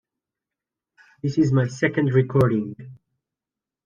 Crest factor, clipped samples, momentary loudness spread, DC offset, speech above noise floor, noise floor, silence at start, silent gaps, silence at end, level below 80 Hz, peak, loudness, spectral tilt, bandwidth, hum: 18 dB; under 0.1%; 12 LU; under 0.1%; 68 dB; -89 dBFS; 1.25 s; none; 0.9 s; -56 dBFS; -6 dBFS; -21 LUFS; -8 dB/octave; 7.4 kHz; none